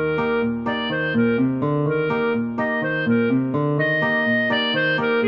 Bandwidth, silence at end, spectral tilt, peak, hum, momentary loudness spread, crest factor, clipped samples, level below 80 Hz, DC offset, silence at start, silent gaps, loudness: 5.6 kHz; 0 s; -8.5 dB/octave; -10 dBFS; none; 4 LU; 12 dB; under 0.1%; -54 dBFS; under 0.1%; 0 s; none; -20 LUFS